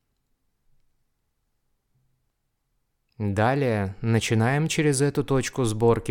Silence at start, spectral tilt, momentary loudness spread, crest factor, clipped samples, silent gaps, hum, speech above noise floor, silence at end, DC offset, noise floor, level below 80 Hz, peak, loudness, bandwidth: 3.2 s; -5.5 dB/octave; 5 LU; 18 dB; under 0.1%; none; none; 52 dB; 0 s; under 0.1%; -75 dBFS; -50 dBFS; -8 dBFS; -24 LUFS; 17 kHz